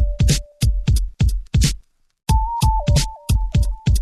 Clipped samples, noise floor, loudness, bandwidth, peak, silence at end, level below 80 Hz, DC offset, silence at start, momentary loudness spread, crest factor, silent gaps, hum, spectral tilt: under 0.1%; -38 dBFS; -20 LUFS; 13 kHz; -6 dBFS; 0 s; -20 dBFS; under 0.1%; 0 s; 4 LU; 12 dB; none; none; -5 dB/octave